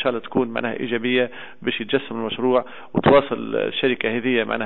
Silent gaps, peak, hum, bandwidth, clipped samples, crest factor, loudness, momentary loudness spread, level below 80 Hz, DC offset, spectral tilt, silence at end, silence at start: none; -6 dBFS; none; 4.2 kHz; under 0.1%; 16 dB; -22 LUFS; 10 LU; -52 dBFS; 0.9%; -9.5 dB/octave; 0 s; 0 s